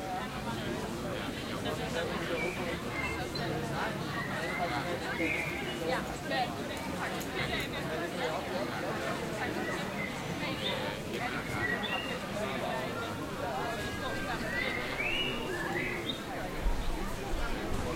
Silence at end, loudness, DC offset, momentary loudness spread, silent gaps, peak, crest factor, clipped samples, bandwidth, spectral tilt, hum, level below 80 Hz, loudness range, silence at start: 0 s; -34 LUFS; under 0.1%; 4 LU; none; -18 dBFS; 16 dB; under 0.1%; 16 kHz; -4.5 dB/octave; none; -44 dBFS; 1 LU; 0 s